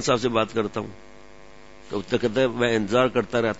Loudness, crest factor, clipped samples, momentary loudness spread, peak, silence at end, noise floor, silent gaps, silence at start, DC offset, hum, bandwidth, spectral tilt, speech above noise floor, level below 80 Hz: -24 LUFS; 20 dB; under 0.1%; 12 LU; -6 dBFS; 0 s; -48 dBFS; none; 0 s; 0.5%; none; 8 kHz; -5 dB/octave; 25 dB; -54 dBFS